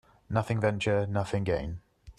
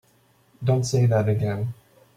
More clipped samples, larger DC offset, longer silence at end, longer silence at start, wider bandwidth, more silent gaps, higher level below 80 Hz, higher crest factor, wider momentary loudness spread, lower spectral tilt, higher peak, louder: neither; neither; second, 0.05 s vs 0.45 s; second, 0.3 s vs 0.6 s; about the same, 11 kHz vs 11.5 kHz; neither; first, -50 dBFS vs -56 dBFS; about the same, 20 dB vs 16 dB; about the same, 8 LU vs 9 LU; about the same, -7 dB/octave vs -7 dB/octave; about the same, -10 dBFS vs -8 dBFS; second, -30 LUFS vs -23 LUFS